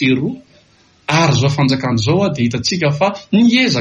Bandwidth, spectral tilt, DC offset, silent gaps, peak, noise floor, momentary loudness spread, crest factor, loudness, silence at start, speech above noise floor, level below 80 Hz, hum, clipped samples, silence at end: 10.5 kHz; -5.5 dB/octave; under 0.1%; none; -2 dBFS; -51 dBFS; 7 LU; 14 dB; -15 LUFS; 0 s; 37 dB; -46 dBFS; none; under 0.1%; 0 s